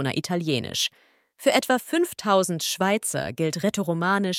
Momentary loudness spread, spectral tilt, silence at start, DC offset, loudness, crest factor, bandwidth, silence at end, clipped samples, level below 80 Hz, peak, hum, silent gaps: 5 LU; -4 dB/octave; 0 s; under 0.1%; -24 LUFS; 20 dB; 17 kHz; 0 s; under 0.1%; -66 dBFS; -6 dBFS; none; none